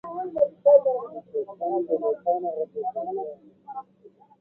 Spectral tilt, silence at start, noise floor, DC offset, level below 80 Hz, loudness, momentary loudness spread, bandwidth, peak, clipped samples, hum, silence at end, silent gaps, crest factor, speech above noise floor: -10.5 dB/octave; 0.05 s; -54 dBFS; under 0.1%; -72 dBFS; -25 LUFS; 22 LU; 2 kHz; -6 dBFS; under 0.1%; none; 0.3 s; none; 20 dB; 27 dB